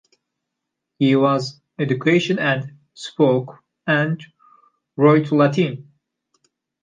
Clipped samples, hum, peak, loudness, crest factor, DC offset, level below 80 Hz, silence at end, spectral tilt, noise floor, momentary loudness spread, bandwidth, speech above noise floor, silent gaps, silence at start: under 0.1%; none; -4 dBFS; -19 LUFS; 16 dB; under 0.1%; -70 dBFS; 1 s; -7 dB/octave; -80 dBFS; 18 LU; 9.4 kHz; 63 dB; none; 1 s